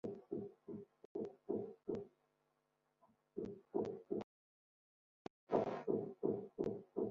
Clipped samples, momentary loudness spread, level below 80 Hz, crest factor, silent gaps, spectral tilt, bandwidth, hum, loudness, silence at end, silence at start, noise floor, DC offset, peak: under 0.1%; 14 LU; -78 dBFS; 24 dB; 1.05-1.15 s, 4.24-5.47 s; -8 dB/octave; 7.2 kHz; none; -45 LUFS; 0 s; 0.05 s; -84 dBFS; under 0.1%; -22 dBFS